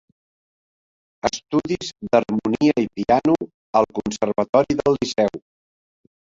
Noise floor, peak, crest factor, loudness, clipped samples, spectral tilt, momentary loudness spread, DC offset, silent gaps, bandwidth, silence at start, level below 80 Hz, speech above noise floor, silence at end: under -90 dBFS; -2 dBFS; 20 dB; -21 LUFS; under 0.1%; -5.5 dB/octave; 7 LU; under 0.1%; 3.54-3.73 s, 4.49-4.53 s; 7.8 kHz; 1.25 s; -52 dBFS; over 70 dB; 1 s